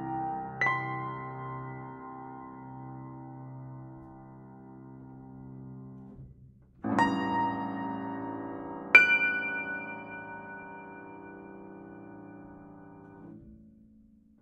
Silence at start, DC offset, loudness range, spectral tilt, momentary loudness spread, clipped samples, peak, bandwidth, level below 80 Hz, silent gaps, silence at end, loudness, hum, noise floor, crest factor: 0 s; under 0.1%; 22 LU; -5.5 dB/octave; 22 LU; under 0.1%; -4 dBFS; 10.5 kHz; -64 dBFS; none; 0.45 s; -28 LUFS; none; -59 dBFS; 30 dB